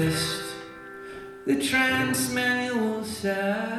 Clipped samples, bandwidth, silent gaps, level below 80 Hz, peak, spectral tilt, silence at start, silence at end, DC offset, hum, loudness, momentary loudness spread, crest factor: under 0.1%; 15 kHz; none; -56 dBFS; -10 dBFS; -4 dB/octave; 0 s; 0 s; under 0.1%; none; -25 LUFS; 18 LU; 16 dB